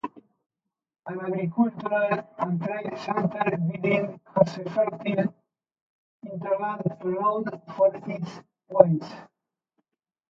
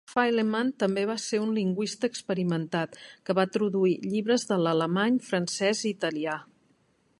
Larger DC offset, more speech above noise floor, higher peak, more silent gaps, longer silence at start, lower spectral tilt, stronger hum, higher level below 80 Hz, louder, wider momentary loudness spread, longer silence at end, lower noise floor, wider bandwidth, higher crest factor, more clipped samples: neither; first, 61 dB vs 40 dB; first, 0 dBFS vs -10 dBFS; first, 5.81-6.20 s vs none; about the same, 0.05 s vs 0.1 s; first, -8.5 dB/octave vs -5 dB/octave; neither; about the same, -70 dBFS vs -74 dBFS; about the same, -26 LUFS vs -27 LUFS; first, 13 LU vs 6 LU; first, 1.05 s vs 0.75 s; first, -87 dBFS vs -67 dBFS; second, 7.4 kHz vs 11.5 kHz; first, 26 dB vs 18 dB; neither